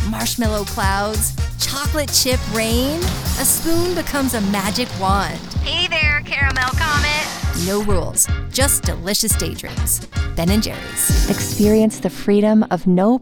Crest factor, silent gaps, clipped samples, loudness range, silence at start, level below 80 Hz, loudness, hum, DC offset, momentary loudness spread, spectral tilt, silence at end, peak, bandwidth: 16 dB; none; under 0.1%; 1 LU; 0 s; -28 dBFS; -18 LUFS; none; under 0.1%; 5 LU; -3.5 dB/octave; 0 s; 0 dBFS; over 20 kHz